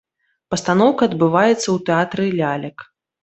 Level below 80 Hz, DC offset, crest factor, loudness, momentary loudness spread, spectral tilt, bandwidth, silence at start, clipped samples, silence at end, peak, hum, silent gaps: -58 dBFS; under 0.1%; 16 dB; -18 LUFS; 10 LU; -5.5 dB/octave; 8.4 kHz; 0.5 s; under 0.1%; 0.4 s; -2 dBFS; none; none